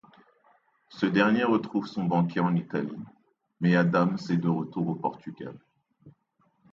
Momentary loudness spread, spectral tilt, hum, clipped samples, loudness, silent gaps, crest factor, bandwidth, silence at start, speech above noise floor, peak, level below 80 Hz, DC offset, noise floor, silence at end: 18 LU; -8 dB/octave; none; under 0.1%; -27 LUFS; none; 20 dB; 7.2 kHz; 0.9 s; 44 dB; -8 dBFS; -70 dBFS; under 0.1%; -70 dBFS; 0.6 s